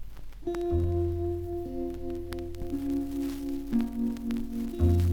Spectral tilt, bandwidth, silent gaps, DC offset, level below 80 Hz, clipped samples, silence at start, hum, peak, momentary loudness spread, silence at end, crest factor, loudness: -8.5 dB/octave; 18 kHz; none; under 0.1%; -42 dBFS; under 0.1%; 0 s; none; -14 dBFS; 9 LU; 0 s; 16 dB; -32 LUFS